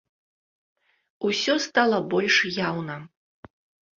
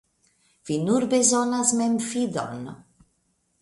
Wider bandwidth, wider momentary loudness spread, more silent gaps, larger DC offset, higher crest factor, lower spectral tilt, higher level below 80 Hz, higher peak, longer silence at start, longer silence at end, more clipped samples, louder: second, 7.8 kHz vs 11.5 kHz; about the same, 12 LU vs 14 LU; neither; neither; about the same, 22 dB vs 22 dB; about the same, -3.5 dB/octave vs -4 dB/octave; about the same, -66 dBFS vs -66 dBFS; about the same, -6 dBFS vs -4 dBFS; first, 1.2 s vs 0.65 s; about the same, 0.9 s vs 0.8 s; neither; about the same, -23 LUFS vs -23 LUFS